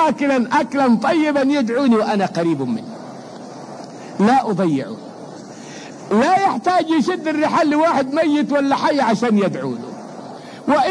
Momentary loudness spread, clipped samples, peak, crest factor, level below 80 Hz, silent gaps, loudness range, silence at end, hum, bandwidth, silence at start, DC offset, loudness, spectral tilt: 18 LU; under 0.1%; -4 dBFS; 14 dB; -62 dBFS; none; 5 LU; 0 s; none; 10.5 kHz; 0 s; under 0.1%; -17 LUFS; -6 dB/octave